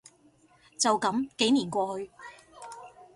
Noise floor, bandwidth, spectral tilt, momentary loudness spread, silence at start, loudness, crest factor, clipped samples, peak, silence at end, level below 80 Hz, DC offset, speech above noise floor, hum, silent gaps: -62 dBFS; 11.5 kHz; -3 dB/octave; 22 LU; 0.8 s; -27 LUFS; 22 dB; under 0.1%; -10 dBFS; 0.1 s; -70 dBFS; under 0.1%; 34 dB; none; none